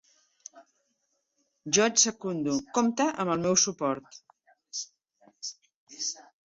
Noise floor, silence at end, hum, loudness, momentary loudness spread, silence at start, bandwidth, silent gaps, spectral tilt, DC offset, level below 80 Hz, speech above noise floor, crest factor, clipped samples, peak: -77 dBFS; 0.25 s; none; -27 LUFS; 17 LU; 0.55 s; 8 kHz; 5.74-5.87 s; -2.5 dB/octave; under 0.1%; -70 dBFS; 50 dB; 24 dB; under 0.1%; -8 dBFS